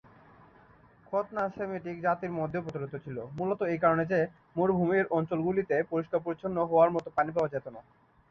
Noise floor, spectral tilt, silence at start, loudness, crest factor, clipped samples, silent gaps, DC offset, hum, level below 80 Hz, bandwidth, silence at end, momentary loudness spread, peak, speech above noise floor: -59 dBFS; -9 dB/octave; 1.1 s; -30 LUFS; 20 dB; under 0.1%; none; under 0.1%; none; -64 dBFS; 7 kHz; 0.5 s; 11 LU; -10 dBFS; 29 dB